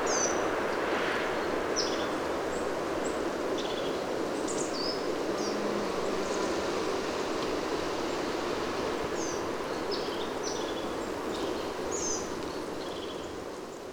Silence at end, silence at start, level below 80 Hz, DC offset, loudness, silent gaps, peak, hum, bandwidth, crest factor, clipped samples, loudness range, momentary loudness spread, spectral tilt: 0 s; 0 s; -56 dBFS; under 0.1%; -32 LUFS; none; -16 dBFS; none; over 20 kHz; 16 dB; under 0.1%; 2 LU; 5 LU; -3 dB/octave